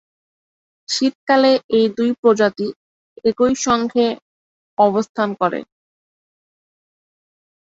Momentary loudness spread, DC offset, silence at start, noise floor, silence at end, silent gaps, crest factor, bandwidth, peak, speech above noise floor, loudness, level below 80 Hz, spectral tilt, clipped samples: 10 LU; under 0.1%; 0.9 s; under -90 dBFS; 2.05 s; 1.15-1.27 s, 1.64-1.69 s, 2.19-2.23 s, 2.76-3.16 s, 4.22-4.77 s, 5.09-5.15 s; 18 dB; 8 kHz; -2 dBFS; over 73 dB; -18 LUFS; -58 dBFS; -4 dB/octave; under 0.1%